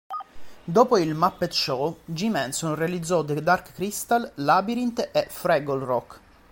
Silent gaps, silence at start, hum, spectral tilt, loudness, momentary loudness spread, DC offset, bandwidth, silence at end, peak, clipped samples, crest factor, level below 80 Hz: none; 0.1 s; none; -4.5 dB/octave; -24 LUFS; 8 LU; under 0.1%; 17 kHz; 0.35 s; -4 dBFS; under 0.1%; 20 dB; -58 dBFS